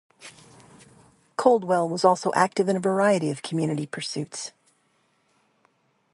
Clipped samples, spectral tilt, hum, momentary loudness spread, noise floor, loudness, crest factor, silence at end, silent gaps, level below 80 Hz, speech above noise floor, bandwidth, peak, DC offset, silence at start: under 0.1%; -5 dB/octave; none; 16 LU; -68 dBFS; -24 LUFS; 22 dB; 1.65 s; none; -72 dBFS; 45 dB; 11.5 kHz; -4 dBFS; under 0.1%; 0.2 s